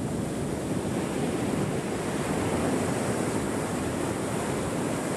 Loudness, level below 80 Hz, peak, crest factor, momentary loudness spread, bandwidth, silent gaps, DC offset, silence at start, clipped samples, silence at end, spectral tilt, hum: -29 LUFS; -48 dBFS; -14 dBFS; 14 dB; 3 LU; 13 kHz; none; under 0.1%; 0 s; under 0.1%; 0 s; -5.5 dB/octave; none